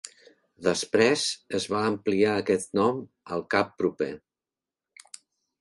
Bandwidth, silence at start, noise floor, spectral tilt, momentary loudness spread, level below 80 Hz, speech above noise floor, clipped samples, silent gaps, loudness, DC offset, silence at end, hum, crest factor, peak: 11.5 kHz; 0.05 s; under -90 dBFS; -4 dB/octave; 14 LU; -64 dBFS; over 64 dB; under 0.1%; none; -26 LUFS; under 0.1%; 1.45 s; none; 20 dB; -8 dBFS